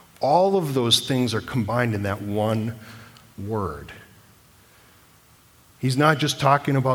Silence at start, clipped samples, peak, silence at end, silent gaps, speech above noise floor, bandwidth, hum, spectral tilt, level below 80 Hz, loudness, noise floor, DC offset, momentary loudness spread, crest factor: 0.2 s; under 0.1%; -2 dBFS; 0 s; none; 33 dB; 19.5 kHz; none; -5 dB/octave; -54 dBFS; -22 LUFS; -54 dBFS; under 0.1%; 15 LU; 22 dB